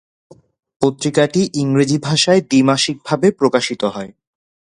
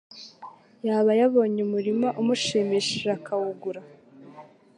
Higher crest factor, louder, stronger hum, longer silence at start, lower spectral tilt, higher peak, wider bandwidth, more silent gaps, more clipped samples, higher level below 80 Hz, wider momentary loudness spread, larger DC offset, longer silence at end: about the same, 16 dB vs 16 dB; first, -16 LUFS vs -24 LUFS; neither; first, 0.8 s vs 0.15 s; about the same, -5 dB/octave vs -4.5 dB/octave; first, 0 dBFS vs -10 dBFS; about the same, 11 kHz vs 11 kHz; neither; neither; first, -58 dBFS vs -72 dBFS; second, 8 LU vs 18 LU; neither; first, 0.6 s vs 0.35 s